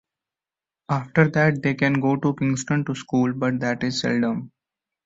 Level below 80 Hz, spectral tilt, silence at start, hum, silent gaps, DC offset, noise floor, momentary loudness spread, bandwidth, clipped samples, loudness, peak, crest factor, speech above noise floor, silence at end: -60 dBFS; -6 dB/octave; 0.9 s; none; none; under 0.1%; under -90 dBFS; 6 LU; 8 kHz; under 0.1%; -22 LUFS; -4 dBFS; 18 dB; over 68 dB; 0.6 s